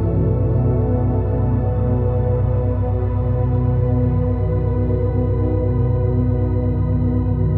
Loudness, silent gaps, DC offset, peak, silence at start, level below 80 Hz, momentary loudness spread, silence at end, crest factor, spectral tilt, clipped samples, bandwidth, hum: -19 LUFS; none; under 0.1%; -6 dBFS; 0 s; -24 dBFS; 2 LU; 0 s; 10 dB; -13.5 dB/octave; under 0.1%; 2.8 kHz; none